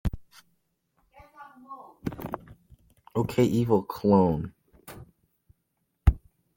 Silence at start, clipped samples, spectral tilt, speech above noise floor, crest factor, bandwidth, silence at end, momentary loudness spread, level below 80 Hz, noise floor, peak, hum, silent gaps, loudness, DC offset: 0.05 s; under 0.1%; -8 dB/octave; 54 dB; 24 dB; 17 kHz; 0.4 s; 25 LU; -38 dBFS; -77 dBFS; -6 dBFS; none; none; -26 LUFS; under 0.1%